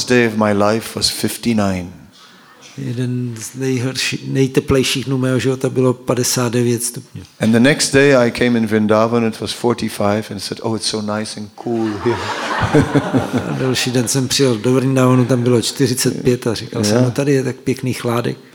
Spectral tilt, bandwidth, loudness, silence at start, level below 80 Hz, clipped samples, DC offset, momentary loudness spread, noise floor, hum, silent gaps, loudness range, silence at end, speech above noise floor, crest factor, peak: -5 dB/octave; 18 kHz; -16 LUFS; 0 s; -46 dBFS; under 0.1%; under 0.1%; 9 LU; -44 dBFS; none; none; 5 LU; 0.15 s; 28 dB; 16 dB; 0 dBFS